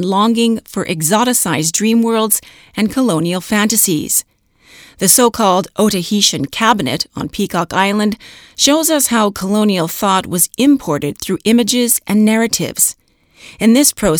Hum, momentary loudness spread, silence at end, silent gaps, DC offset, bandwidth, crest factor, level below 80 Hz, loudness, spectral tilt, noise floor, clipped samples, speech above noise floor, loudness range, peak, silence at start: none; 8 LU; 0 s; none; under 0.1%; over 20 kHz; 14 dB; -46 dBFS; -13 LUFS; -3.5 dB/octave; -46 dBFS; under 0.1%; 32 dB; 1 LU; 0 dBFS; 0 s